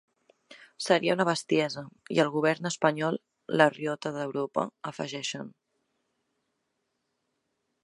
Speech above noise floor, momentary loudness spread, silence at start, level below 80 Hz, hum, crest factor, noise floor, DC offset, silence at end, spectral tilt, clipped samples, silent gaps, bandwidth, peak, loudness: 52 dB; 12 LU; 0.5 s; -78 dBFS; none; 26 dB; -80 dBFS; under 0.1%; 2.35 s; -4.5 dB/octave; under 0.1%; none; 11.5 kHz; -4 dBFS; -28 LUFS